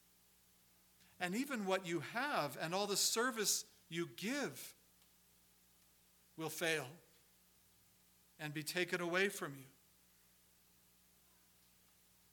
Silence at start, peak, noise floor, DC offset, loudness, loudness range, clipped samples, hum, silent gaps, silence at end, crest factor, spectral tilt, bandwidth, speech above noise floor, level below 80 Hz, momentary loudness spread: 1.2 s; -20 dBFS; -71 dBFS; under 0.1%; -39 LUFS; 9 LU; under 0.1%; 60 Hz at -75 dBFS; none; 2.65 s; 24 dB; -2.5 dB/octave; 19 kHz; 31 dB; -84 dBFS; 14 LU